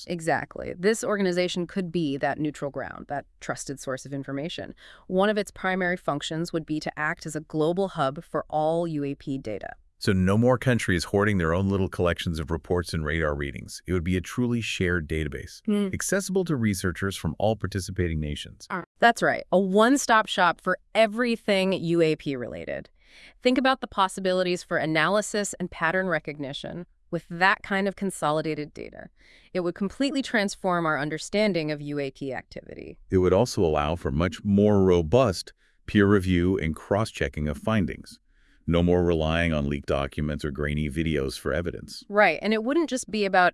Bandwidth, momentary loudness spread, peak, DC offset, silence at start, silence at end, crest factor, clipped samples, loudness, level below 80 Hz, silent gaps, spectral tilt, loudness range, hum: 12 kHz; 13 LU; -4 dBFS; under 0.1%; 0 s; 0 s; 20 dB; under 0.1%; -26 LUFS; -46 dBFS; 18.86-18.95 s; -5.5 dB/octave; 5 LU; none